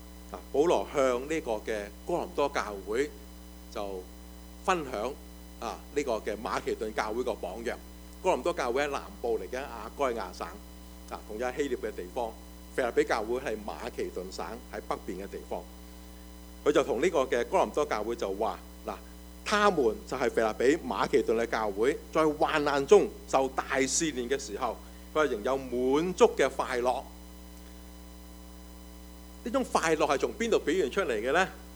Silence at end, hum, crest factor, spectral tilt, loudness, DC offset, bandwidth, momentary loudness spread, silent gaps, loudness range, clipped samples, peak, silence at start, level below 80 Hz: 0 s; none; 22 dB; -4 dB/octave; -30 LUFS; under 0.1%; over 20 kHz; 21 LU; none; 8 LU; under 0.1%; -8 dBFS; 0 s; -50 dBFS